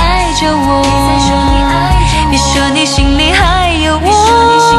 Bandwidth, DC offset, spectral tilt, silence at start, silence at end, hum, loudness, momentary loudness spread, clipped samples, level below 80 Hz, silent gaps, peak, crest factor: 13 kHz; under 0.1%; -4 dB/octave; 0 s; 0 s; none; -9 LUFS; 4 LU; 0.3%; -16 dBFS; none; 0 dBFS; 8 dB